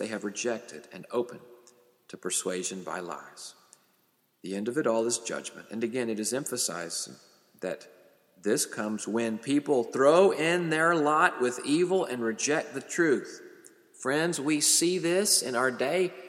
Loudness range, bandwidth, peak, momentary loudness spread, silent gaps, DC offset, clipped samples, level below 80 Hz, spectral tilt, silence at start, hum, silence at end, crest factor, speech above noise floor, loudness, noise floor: 10 LU; 16.5 kHz; -8 dBFS; 16 LU; none; under 0.1%; under 0.1%; -82 dBFS; -3 dB/octave; 0 s; none; 0 s; 22 dB; 42 dB; -27 LUFS; -70 dBFS